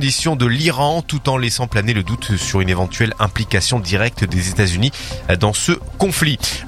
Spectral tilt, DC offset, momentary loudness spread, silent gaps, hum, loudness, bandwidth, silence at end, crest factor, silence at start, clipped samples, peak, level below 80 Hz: -4.5 dB/octave; under 0.1%; 4 LU; none; none; -17 LUFS; 16 kHz; 0 s; 16 dB; 0 s; under 0.1%; 0 dBFS; -34 dBFS